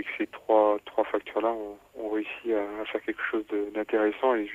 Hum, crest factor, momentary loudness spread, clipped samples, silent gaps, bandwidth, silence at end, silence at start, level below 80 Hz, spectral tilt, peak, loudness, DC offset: 50 Hz at -70 dBFS; 18 dB; 10 LU; under 0.1%; none; 14 kHz; 0 s; 0 s; -66 dBFS; -5.5 dB/octave; -10 dBFS; -28 LUFS; under 0.1%